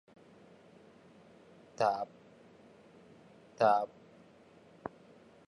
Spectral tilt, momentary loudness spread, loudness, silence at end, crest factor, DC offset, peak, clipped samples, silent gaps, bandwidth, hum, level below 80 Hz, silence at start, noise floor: -5.5 dB/octave; 20 LU; -32 LUFS; 0.6 s; 24 dB; under 0.1%; -16 dBFS; under 0.1%; none; 10.5 kHz; none; -80 dBFS; 1.8 s; -60 dBFS